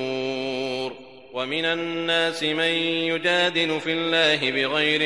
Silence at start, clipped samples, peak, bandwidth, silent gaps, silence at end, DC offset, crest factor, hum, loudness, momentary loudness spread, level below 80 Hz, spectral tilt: 0 s; under 0.1%; -6 dBFS; 11.5 kHz; none; 0 s; 0.2%; 18 dB; none; -22 LUFS; 10 LU; -68 dBFS; -3.5 dB/octave